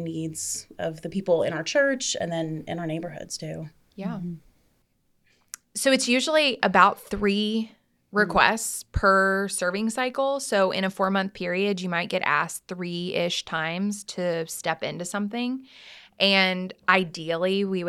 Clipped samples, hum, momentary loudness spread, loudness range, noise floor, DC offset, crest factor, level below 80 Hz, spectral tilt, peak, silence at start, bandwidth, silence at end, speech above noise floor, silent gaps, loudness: under 0.1%; none; 14 LU; 7 LU; -68 dBFS; under 0.1%; 24 dB; -50 dBFS; -3.5 dB/octave; -2 dBFS; 0 s; 15 kHz; 0 s; 43 dB; none; -25 LUFS